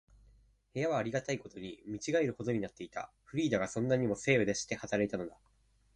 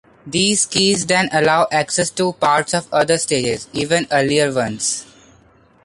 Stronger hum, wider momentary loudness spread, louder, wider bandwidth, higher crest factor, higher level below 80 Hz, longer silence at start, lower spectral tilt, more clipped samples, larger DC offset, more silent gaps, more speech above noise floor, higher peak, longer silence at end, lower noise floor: neither; first, 14 LU vs 6 LU; second, -34 LUFS vs -17 LUFS; about the same, 11 kHz vs 11.5 kHz; first, 22 dB vs 16 dB; second, -64 dBFS vs -52 dBFS; first, 0.75 s vs 0.25 s; first, -5 dB/octave vs -3 dB/octave; neither; neither; neither; about the same, 31 dB vs 34 dB; second, -14 dBFS vs -2 dBFS; second, 0.6 s vs 0.8 s; first, -65 dBFS vs -51 dBFS